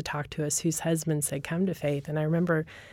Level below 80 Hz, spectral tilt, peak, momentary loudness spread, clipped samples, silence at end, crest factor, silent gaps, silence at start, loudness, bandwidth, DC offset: -58 dBFS; -5 dB/octave; -14 dBFS; 4 LU; under 0.1%; 0 s; 14 dB; none; 0 s; -29 LUFS; 16.5 kHz; under 0.1%